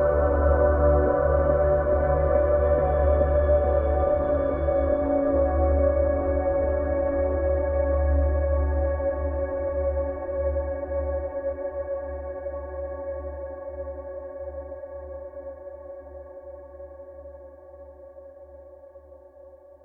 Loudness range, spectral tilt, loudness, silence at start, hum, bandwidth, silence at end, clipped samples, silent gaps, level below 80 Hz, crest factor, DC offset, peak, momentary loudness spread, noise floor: 20 LU; -12.5 dB/octave; -24 LUFS; 0 s; none; 2.5 kHz; 0.3 s; under 0.1%; none; -30 dBFS; 16 dB; under 0.1%; -10 dBFS; 20 LU; -49 dBFS